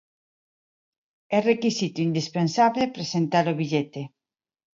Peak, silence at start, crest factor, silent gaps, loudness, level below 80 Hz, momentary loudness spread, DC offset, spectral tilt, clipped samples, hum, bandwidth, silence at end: -6 dBFS; 1.3 s; 18 dB; none; -24 LUFS; -70 dBFS; 6 LU; under 0.1%; -5.5 dB/octave; under 0.1%; none; 7.6 kHz; 0.7 s